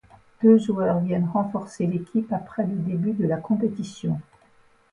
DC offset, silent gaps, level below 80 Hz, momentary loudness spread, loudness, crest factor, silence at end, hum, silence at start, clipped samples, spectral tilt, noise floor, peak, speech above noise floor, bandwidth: under 0.1%; none; -60 dBFS; 11 LU; -24 LUFS; 18 dB; 0.7 s; none; 0.4 s; under 0.1%; -8.5 dB/octave; -58 dBFS; -6 dBFS; 35 dB; 10.5 kHz